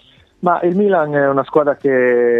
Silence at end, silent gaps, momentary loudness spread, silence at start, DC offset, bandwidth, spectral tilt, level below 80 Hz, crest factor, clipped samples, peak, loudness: 0 s; none; 3 LU; 0.4 s; under 0.1%; 4.1 kHz; -9.5 dB/octave; -62 dBFS; 14 dB; under 0.1%; -2 dBFS; -15 LUFS